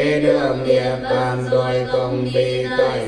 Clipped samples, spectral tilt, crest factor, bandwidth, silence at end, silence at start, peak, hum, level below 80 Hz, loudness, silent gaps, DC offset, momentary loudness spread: under 0.1%; -6.5 dB/octave; 14 dB; 10.5 kHz; 0 s; 0 s; -4 dBFS; none; -46 dBFS; -19 LUFS; none; under 0.1%; 3 LU